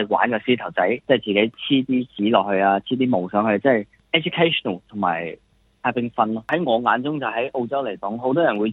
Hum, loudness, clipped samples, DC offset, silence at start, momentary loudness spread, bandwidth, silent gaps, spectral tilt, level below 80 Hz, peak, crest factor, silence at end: none; -21 LUFS; under 0.1%; under 0.1%; 0 s; 6 LU; 4.1 kHz; none; -8 dB/octave; -64 dBFS; -2 dBFS; 20 dB; 0 s